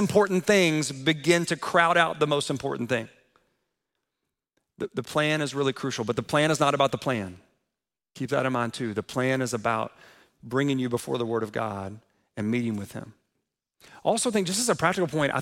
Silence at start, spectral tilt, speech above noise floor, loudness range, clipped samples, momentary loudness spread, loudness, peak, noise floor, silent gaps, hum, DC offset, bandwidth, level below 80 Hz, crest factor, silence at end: 0 s; -4.5 dB/octave; 61 dB; 6 LU; under 0.1%; 12 LU; -26 LUFS; -6 dBFS; -87 dBFS; none; none; under 0.1%; 16.5 kHz; -64 dBFS; 22 dB; 0 s